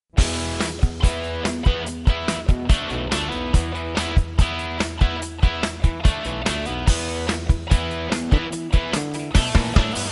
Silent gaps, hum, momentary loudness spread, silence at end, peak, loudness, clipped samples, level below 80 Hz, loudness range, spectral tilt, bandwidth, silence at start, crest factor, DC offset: none; none; 4 LU; 0 s; -2 dBFS; -22 LUFS; under 0.1%; -22 dBFS; 1 LU; -5 dB/octave; 11.5 kHz; 0.15 s; 20 dB; under 0.1%